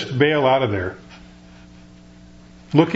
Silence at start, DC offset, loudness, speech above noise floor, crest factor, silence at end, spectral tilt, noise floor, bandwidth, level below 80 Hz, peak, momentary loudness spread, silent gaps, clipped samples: 0 s; under 0.1%; -19 LUFS; 26 dB; 22 dB; 0 s; -7.5 dB/octave; -45 dBFS; 8 kHz; -50 dBFS; 0 dBFS; 14 LU; none; under 0.1%